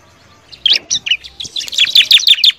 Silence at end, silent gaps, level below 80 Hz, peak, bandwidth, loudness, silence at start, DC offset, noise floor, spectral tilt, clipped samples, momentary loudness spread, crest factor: 0.05 s; none; -52 dBFS; 0 dBFS; over 20 kHz; -9 LUFS; 0.5 s; under 0.1%; -45 dBFS; 3 dB/octave; 0.9%; 13 LU; 14 dB